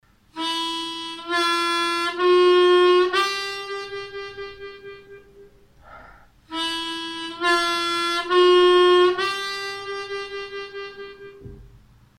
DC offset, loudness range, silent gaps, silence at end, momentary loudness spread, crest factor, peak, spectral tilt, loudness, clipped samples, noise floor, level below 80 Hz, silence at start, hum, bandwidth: under 0.1%; 13 LU; none; 0.5 s; 21 LU; 16 dB; -8 dBFS; -2.5 dB/octave; -20 LUFS; under 0.1%; -51 dBFS; -58 dBFS; 0.35 s; none; 13 kHz